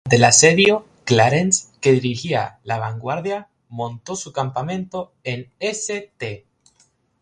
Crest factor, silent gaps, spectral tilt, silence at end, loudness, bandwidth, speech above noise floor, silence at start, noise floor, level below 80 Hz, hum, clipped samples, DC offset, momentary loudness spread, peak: 20 dB; none; -3.5 dB/octave; 0.85 s; -19 LUFS; 11 kHz; 42 dB; 0.05 s; -61 dBFS; -56 dBFS; none; under 0.1%; under 0.1%; 18 LU; 0 dBFS